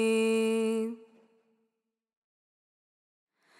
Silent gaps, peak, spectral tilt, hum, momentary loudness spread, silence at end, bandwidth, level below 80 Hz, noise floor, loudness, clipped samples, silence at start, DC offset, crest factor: none; -18 dBFS; -4.5 dB/octave; none; 13 LU; 2.6 s; 14 kHz; under -90 dBFS; -84 dBFS; -29 LUFS; under 0.1%; 0 s; under 0.1%; 16 dB